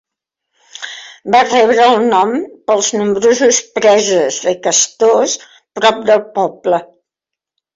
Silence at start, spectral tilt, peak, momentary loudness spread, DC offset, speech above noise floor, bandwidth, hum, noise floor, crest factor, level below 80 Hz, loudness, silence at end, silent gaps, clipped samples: 0.8 s; -2 dB/octave; 0 dBFS; 12 LU; under 0.1%; 72 dB; 7.8 kHz; none; -83 dBFS; 14 dB; -60 dBFS; -12 LUFS; 0.9 s; none; under 0.1%